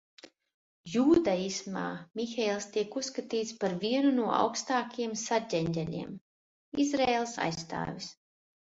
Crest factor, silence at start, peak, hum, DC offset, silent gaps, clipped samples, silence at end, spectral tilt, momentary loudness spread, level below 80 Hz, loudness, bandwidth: 18 dB; 0.85 s; -12 dBFS; none; under 0.1%; 6.21-6.72 s; under 0.1%; 0.6 s; -4.5 dB/octave; 11 LU; -64 dBFS; -31 LUFS; 8 kHz